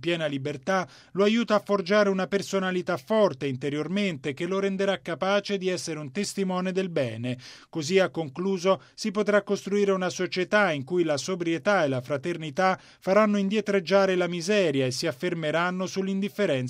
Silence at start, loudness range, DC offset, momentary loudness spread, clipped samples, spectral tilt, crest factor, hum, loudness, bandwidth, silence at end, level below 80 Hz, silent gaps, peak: 0 s; 3 LU; under 0.1%; 8 LU; under 0.1%; -5 dB/octave; 18 dB; none; -26 LUFS; 15.5 kHz; 0 s; -70 dBFS; none; -8 dBFS